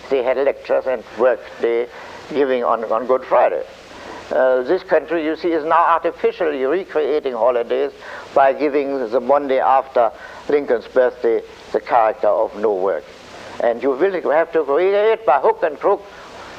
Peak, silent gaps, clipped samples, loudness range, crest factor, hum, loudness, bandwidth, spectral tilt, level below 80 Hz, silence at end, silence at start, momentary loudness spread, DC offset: -2 dBFS; none; under 0.1%; 2 LU; 16 dB; none; -18 LUFS; 8.6 kHz; -5.5 dB/octave; -56 dBFS; 0 s; 0.05 s; 10 LU; under 0.1%